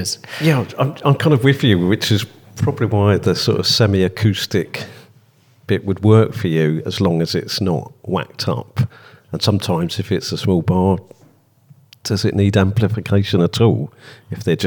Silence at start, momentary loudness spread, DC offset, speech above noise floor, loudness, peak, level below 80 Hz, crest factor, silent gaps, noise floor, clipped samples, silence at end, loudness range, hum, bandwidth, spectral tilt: 0 s; 10 LU; under 0.1%; 36 dB; -17 LUFS; -2 dBFS; -52 dBFS; 16 dB; none; -52 dBFS; under 0.1%; 0 s; 4 LU; none; 19 kHz; -6 dB/octave